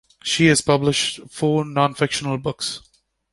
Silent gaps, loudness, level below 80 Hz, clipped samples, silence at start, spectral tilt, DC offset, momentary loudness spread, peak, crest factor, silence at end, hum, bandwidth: none; -20 LUFS; -52 dBFS; under 0.1%; 0.25 s; -4 dB/octave; under 0.1%; 10 LU; -2 dBFS; 18 dB; 0.55 s; none; 11.5 kHz